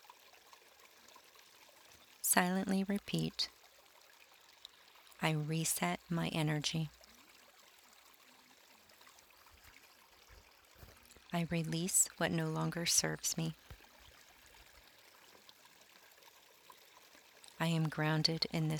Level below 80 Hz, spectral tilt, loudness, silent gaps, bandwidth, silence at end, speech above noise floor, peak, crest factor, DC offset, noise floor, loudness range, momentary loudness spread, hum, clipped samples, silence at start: -70 dBFS; -3.5 dB/octave; -35 LUFS; none; 19.5 kHz; 0 s; 28 dB; -12 dBFS; 28 dB; under 0.1%; -64 dBFS; 10 LU; 28 LU; none; under 0.1%; 2.25 s